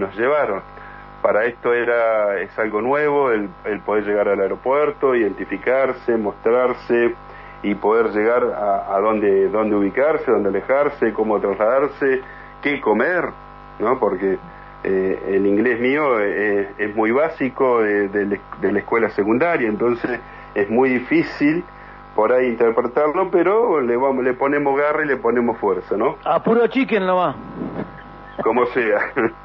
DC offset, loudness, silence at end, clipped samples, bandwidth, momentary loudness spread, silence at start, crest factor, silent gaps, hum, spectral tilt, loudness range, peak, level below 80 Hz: under 0.1%; -19 LUFS; 0 s; under 0.1%; 5.8 kHz; 8 LU; 0 s; 14 dB; none; 50 Hz at -50 dBFS; -8.5 dB/octave; 2 LU; -4 dBFS; -50 dBFS